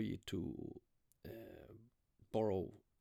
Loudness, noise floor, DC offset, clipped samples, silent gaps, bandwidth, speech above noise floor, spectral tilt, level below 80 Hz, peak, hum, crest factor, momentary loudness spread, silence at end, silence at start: -44 LUFS; -71 dBFS; under 0.1%; under 0.1%; none; 17 kHz; 30 dB; -7 dB/octave; -68 dBFS; -26 dBFS; none; 20 dB; 21 LU; 0.25 s; 0 s